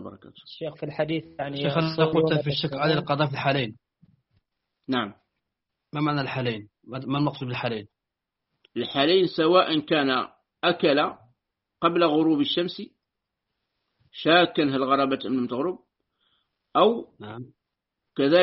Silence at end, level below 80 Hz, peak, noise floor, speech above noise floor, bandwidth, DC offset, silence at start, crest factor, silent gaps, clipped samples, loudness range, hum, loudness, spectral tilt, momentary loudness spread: 0 s; -64 dBFS; -6 dBFS; -85 dBFS; 61 dB; 5.8 kHz; under 0.1%; 0 s; 20 dB; none; under 0.1%; 7 LU; none; -24 LUFS; -4 dB/octave; 16 LU